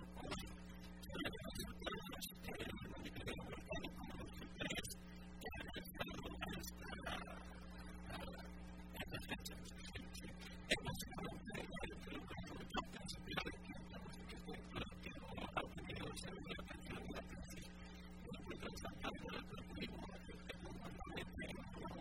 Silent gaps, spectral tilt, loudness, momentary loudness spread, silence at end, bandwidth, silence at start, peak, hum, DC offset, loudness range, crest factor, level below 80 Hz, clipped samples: none; -4.5 dB/octave; -50 LUFS; 8 LU; 0 s; 16 kHz; 0 s; -22 dBFS; none; under 0.1%; 3 LU; 28 dB; -58 dBFS; under 0.1%